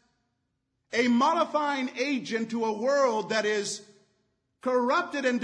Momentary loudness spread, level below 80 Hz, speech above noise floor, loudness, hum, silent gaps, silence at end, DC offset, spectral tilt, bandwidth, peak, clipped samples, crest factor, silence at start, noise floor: 8 LU; -82 dBFS; 52 dB; -27 LUFS; none; none; 0 s; under 0.1%; -3.5 dB/octave; 10.5 kHz; -12 dBFS; under 0.1%; 16 dB; 0.9 s; -78 dBFS